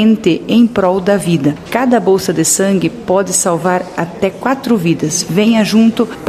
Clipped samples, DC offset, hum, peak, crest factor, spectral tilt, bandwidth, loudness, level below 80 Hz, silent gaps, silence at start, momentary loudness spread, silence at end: under 0.1%; under 0.1%; none; 0 dBFS; 12 dB; -4.5 dB/octave; 15 kHz; -13 LUFS; -46 dBFS; none; 0 s; 5 LU; 0 s